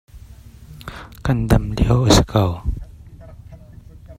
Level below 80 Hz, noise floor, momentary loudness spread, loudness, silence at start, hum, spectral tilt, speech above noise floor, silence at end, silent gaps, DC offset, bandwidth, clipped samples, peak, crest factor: -28 dBFS; -41 dBFS; 21 LU; -18 LUFS; 0.15 s; none; -5.5 dB/octave; 24 dB; 0.05 s; none; under 0.1%; 16 kHz; under 0.1%; 0 dBFS; 20 dB